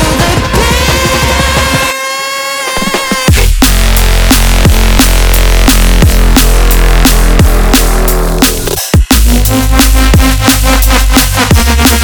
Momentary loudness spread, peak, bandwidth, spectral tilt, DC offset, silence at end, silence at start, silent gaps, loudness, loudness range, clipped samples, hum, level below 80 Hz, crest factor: 4 LU; 0 dBFS; over 20 kHz; -4 dB/octave; under 0.1%; 0 s; 0 s; none; -8 LUFS; 2 LU; 0.6%; none; -8 dBFS; 6 dB